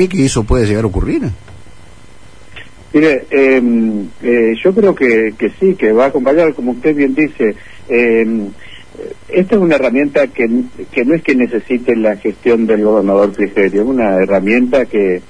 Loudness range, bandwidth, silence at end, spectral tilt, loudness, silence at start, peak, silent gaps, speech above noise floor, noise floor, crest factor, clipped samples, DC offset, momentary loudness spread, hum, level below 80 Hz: 3 LU; 10.5 kHz; 0.1 s; -6.5 dB/octave; -12 LUFS; 0 s; 0 dBFS; none; 28 dB; -40 dBFS; 12 dB; under 0.1%; 2%; 6 LU; none; -32 dBFS